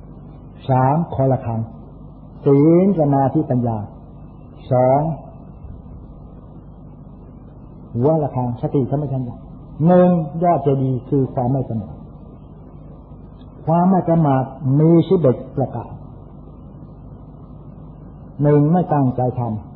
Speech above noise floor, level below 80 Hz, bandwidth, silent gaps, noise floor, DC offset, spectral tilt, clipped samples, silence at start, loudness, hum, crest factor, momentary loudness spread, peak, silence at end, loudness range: 22 dB; -42 dBFS; 4.2 kHz; none; -39 dBFS; under 0.1%; -14.5 dB/octave; under 0.1%; 0.05 s; -17 LUFS; none; 16 dB; 26 LU; -2 dBFS; 0 s; 7 LU